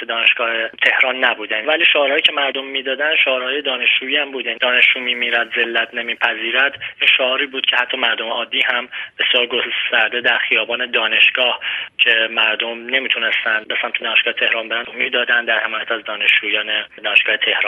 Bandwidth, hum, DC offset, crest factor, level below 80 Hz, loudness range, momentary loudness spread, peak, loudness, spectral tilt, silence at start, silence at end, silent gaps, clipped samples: 9.4 kHz; none; under 0.1%; 18 dB; -72 dBFS; 2 LU; 7 LU; 0 dBFS; -15 LUFS; -2.5 dB/octave; 0 s; 0 s; none; under 0.1%